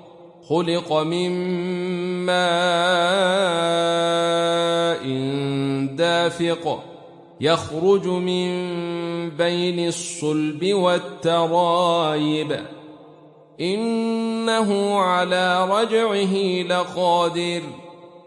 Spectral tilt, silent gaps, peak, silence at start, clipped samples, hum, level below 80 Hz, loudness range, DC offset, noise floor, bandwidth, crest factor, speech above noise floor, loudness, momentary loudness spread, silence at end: -5 dB/octave; none; -4 dBFS; 0.05 s; under 0.1%; none; -68 dBFS; 3 LU; under 0.1%; -48 dBFS; 11.5 kHz; 16 dB; 27 dB; -21 LUFS; 7 LU; 0.1 s